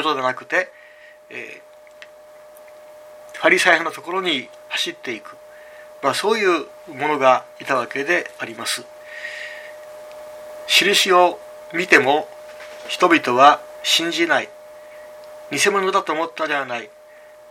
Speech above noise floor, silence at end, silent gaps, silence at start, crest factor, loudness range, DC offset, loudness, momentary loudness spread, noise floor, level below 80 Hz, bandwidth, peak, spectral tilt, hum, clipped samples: 27 dB; 0.6 s; none; 0 s; 22 dB; 6 LU; under 0.1%; -18 LUFS; 23 LU; -45 dBFS; -70 dBFS; 17 kHz; 0 dBFS; -2 dB/octave; none; under 0.1%